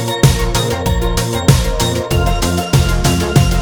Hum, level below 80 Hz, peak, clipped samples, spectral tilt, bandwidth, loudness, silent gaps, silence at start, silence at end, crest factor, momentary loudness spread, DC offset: none; -20 dBFS; 0 dBFS; under 0.1%; -5 dB/octave; over 20 kHz; -14 LUFS; none; 0 s; 0 s; 14 dB; 4 LU; under 0.1%